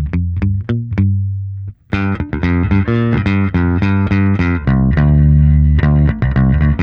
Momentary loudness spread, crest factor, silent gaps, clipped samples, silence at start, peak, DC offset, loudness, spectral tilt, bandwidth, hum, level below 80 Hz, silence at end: 8 LU; 12 dB; none; under 0.1%; 0 s; -2 dBFS; under 0.1%; -14 LUFS; -10 dB/octave; 5.4 kHz; none; -20 dBFS; 0 s